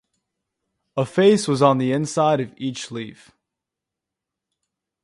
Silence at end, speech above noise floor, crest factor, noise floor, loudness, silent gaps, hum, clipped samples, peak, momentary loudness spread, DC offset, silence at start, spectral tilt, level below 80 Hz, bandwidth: 1.9 s; 66 dB; 22 dB; -85 dBFS; -20 LUFS; none; none; under 0.1%; 0 dBFS; 15 LU; under 0.1%; 0.95 s; -5.5 dB/octave; -66 dBFS; 11.5 kHz